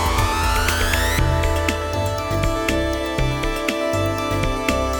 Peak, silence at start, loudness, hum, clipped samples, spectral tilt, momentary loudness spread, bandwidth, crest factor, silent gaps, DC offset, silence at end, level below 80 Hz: -4 dBFS; 0 s; -21 LUFS; none; under 0.1%; -4.5 dB/octave; 4 LU; over 20 kHz; 16 dB; none; under 0.1%; 0 s; -26 dBFS